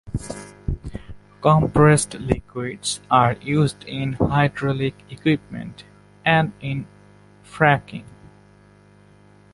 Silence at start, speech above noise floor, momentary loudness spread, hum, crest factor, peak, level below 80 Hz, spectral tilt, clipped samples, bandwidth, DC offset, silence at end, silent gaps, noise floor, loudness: 0.05 s; 31 dB; 19 LU; 50 Hz at -40 dBFS; 20 dB; -2 dBFS; -42 dBFS; -5.5 dB/octave; under 0.1%; 11.5 kHz; under 0.1%; 1.5 s; none; -51 dBFS; -21 LUFS